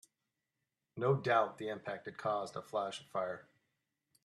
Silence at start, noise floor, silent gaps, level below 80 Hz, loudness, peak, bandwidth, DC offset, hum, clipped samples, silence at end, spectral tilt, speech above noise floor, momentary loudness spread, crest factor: 0.95 s; -88 dBFS; none; -82 dBFS; -37 LUFS; -18 dBFS; 12.5 kHz; under 0.1%; none; under 0.1%; 0.8 s; -6 dB/octave; 52 dB; 12 LU; 20 dB